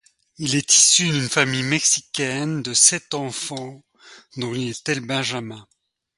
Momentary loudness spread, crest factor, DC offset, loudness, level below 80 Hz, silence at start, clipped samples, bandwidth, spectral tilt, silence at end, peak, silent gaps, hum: 17 LU; 22 dB; under 0.1%; -18 LUFS; -62 dBFS; 0.4 s; under 0.1%; 11.5 kHz; -2 dB/octave; 0.55 s; 0 dBFS; none; none